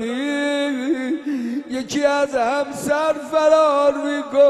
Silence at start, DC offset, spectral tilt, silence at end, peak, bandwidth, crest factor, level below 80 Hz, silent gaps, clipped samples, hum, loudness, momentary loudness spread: 0 s; under 0.1%; -4 dB/octave; 0 s; -4 dBFS; 13.5 kHz; 16 dB; -60 dBFS; none; under 0.1%; none; -20 LUFS; 10 LU